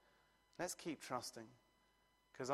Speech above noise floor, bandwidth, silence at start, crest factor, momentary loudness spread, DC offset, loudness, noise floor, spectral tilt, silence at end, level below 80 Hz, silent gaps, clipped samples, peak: 29 dB; 15.5 kHz; 0.6 s; 24 dB; 16 LU; under 0.1%; -48 LUFS; -77 dBFS; -3.5 dB/octave; 0 s; -82 dBFS; none; under 0.1%; -26 dBFS